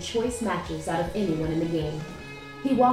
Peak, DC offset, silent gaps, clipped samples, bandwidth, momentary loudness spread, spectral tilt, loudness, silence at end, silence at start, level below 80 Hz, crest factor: -10 dBFS; under 0.1%; none; under 0.1%; 15.5 kHz; 11 LU; -6 dB/octave; -28 LUFS; 0 s; 0 s; -46 dBFS; 18 dB